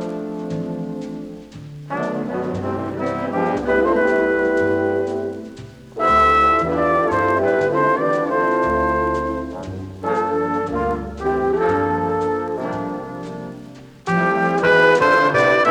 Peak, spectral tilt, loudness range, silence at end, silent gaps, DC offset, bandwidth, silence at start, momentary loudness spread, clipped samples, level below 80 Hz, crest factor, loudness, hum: -4 dBFS; -6.5 dB/octave; 6 LU; 0 s; none; under 0.1%; 11.5 kHz; 0 s; 17 LU; under 0.1%; -42 dBFS; 16 dB; -19 LUFS; none